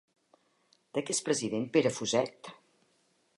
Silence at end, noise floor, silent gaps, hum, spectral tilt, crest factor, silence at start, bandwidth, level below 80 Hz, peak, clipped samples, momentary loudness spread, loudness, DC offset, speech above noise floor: 0.85 s; -72 dBFS; none; none; -3.5 dB/octave; 22 dB; 0.95 s; 11.5 kHz; -76 dBFS; -12 dBFS; under 0.1%; 13 LU; -31 LUFS; under 0.1%; 41 dB